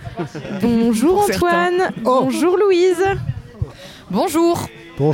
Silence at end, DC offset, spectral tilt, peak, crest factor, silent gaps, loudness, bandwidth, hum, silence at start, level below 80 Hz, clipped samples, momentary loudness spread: 0 s; under 0.1%; -6 dB/octave; -6 dBFS; 10 dB; none; -17 LUFS; 17 kHz; none; 0 s; -42 dBFS; under 0.1%; 14 LU